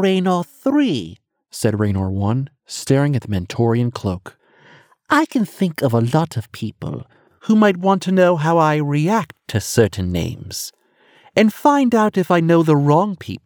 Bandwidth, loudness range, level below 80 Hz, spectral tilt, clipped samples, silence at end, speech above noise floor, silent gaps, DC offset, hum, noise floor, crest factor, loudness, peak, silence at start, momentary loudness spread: over 20 kHz; 4 LU; -52 dBFS; -6.5 dB/octave; under 0.1%; 0.05 s; 37 dB; none; under 0.1%; none; -54 dBFS; 16 dB; -18 LUFS; 0 dBFS; 0 s; 14 LU